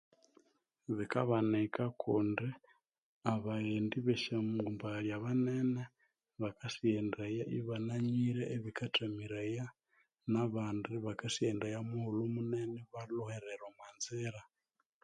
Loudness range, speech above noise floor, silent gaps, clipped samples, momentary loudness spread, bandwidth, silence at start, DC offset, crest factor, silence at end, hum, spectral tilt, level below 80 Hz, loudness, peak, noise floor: 3 LU; 48 dB; 3.02-3.21 s; under 0.1%; 10 LU; 11 kHz; 0.9 s; under 0.1%; 22 dB; 0.6 s; none; -6 dB/octave; -72 dBFS; -38 LUFS; -16 dBFS; -85 dBFS